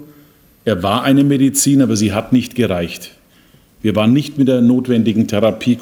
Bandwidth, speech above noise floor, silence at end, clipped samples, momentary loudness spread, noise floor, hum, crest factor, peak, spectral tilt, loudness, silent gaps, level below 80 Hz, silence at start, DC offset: 18.5 kHz; 36 dB; 0 s; under 0.1%; 9 LU; -49 dBFS; none; 14 dB; -2 dBFS; -5.5 dB/octave; -14 LUFS; none; -50 dBFS; 0 s; under 0.1%